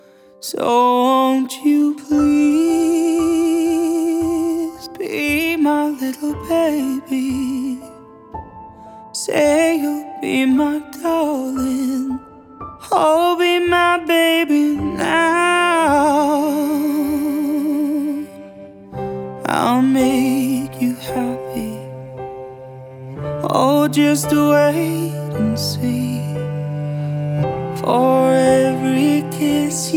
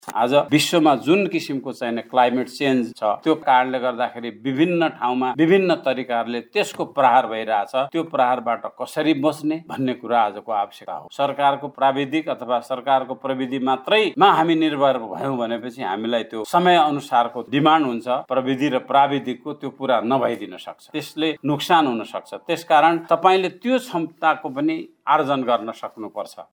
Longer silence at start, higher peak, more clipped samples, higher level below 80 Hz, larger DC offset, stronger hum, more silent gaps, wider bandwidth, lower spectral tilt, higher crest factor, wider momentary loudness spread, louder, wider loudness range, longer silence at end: first, 0.4 s vs 0.05 s; about the same, -2 dBFS vs -2 dBFS; neither; first, -50 dBFS vs -76 dBFS; neither; neither; neither; about the same, 18.5 kHz vs over 20 kHz; about the same, -5 dB/octave vs -5 dB/octave; about the same, 16 dB vs 18 dB; first, 15 LU vs 11 LU; first, -17 LUFS vs -20 LUFS; about the same, 5 LU vs 3 LU; about the same, 0 s vs 0.1 s